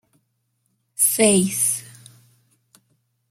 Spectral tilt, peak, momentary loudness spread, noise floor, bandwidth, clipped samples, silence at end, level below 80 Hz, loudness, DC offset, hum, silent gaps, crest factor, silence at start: -3 dB/octave; -2 dBFS; 12 LU; -71 dBFS; 16.5 kHz; under 0.1%; 1.45 s; -64 dBFS; -18 LUFS; under 0.1%; none; none; 22 dB; 1 s